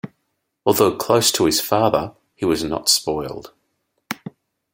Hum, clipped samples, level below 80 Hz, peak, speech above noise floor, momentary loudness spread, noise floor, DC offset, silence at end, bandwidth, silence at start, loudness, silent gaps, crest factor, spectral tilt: none; under 0.1%; -52 dBFS; -2 dBFS; 55 dB; 17 LU; -73 dBFS; under 0.1%; 0.45 s; 16.5 kHz; 0.05 s; -18 LUFS; none; 20 dB; -3.5 dB/octave